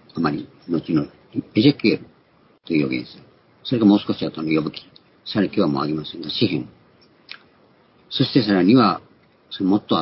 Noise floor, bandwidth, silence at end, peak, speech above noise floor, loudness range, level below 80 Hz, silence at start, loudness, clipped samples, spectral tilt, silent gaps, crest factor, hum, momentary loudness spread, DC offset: -56 dBFS; 5.8 kHz; 0 s; -2 dBFS; 37 dB; 3 LU; -56 dBFS; 0.15 s; -21 LUFS; under 0.1%; -11 dB/octave; none; 20 dB; none; 20 LU; under 0.1%